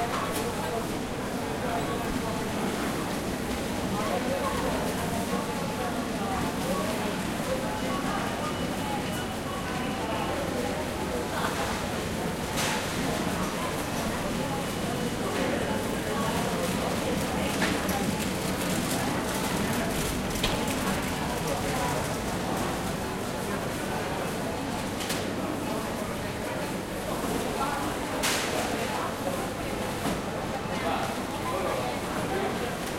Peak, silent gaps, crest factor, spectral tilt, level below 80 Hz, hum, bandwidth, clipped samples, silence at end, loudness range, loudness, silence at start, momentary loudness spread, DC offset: -12 dBFS; none; 18 dB; -4.5 dB/octave; -44 dBFS; none; 16 kHz; under 0.1%; 0 s; 3 LU; -30 LUFS; 0 s; 4 LU; under 0.1%